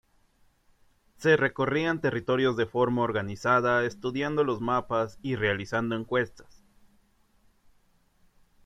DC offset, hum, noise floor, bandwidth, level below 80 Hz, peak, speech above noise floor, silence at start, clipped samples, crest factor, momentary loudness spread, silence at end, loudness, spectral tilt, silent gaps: under 0.1%; none; -65 dBFS; 11.5 kHz; -60 dBFS; -8 dBFS; 38 dB; 1.2 s; under 0.1%; 20 dB; 6 LU; 2.25 s; -27 LUFS; -6.5 dB/octave; none